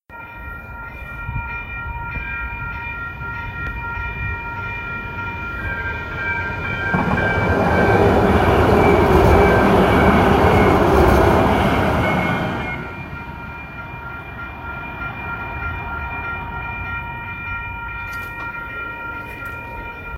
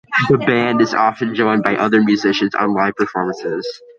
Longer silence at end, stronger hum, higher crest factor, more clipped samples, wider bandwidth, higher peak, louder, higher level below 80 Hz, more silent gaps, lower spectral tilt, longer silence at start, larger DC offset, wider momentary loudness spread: second, 0 s vs 0.2 s; neither; about the same, 18 dB vs 16 dB; neither; first, 16 kHz vs 7.4 kHz; about the same, 0 dBFS vs 0 dBFS; second, -19 LUFS vs -16 LUFS; first, -30 dBFS vs -56 dBFS; neither; about the same, -7 dB/octave vs -6 dB/octave; about the same, 0.1 s vs 0.1 s; neither; first, 17 LU vs 7 LU